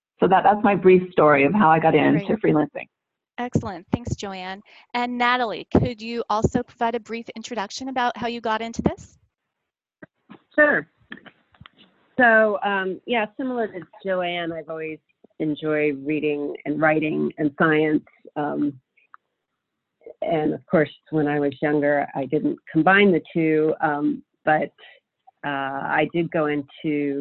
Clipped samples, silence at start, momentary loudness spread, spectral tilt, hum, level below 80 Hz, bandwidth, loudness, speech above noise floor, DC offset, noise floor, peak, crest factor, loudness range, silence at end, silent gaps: under 0.1%; 0.2 s; 15 LU; -6.5 dB/octave; none; -50 dBFS; 7.8 kHz; -22 LUFS; 62 dB; under 0.1%; -83 dBFS; -4 dBFS; 18 dB; 6 LU; 0 s; none